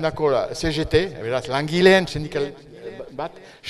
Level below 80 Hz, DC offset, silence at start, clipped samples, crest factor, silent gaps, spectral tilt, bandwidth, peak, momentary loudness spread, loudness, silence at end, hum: -42 dBFS; under 0.1%; 0 s; under 0.1%; 20 dB; none; -5.5 dB/octave; 12.5 kHz; -2 dBFS; 19 LU; -21 LUFS; 0 s; none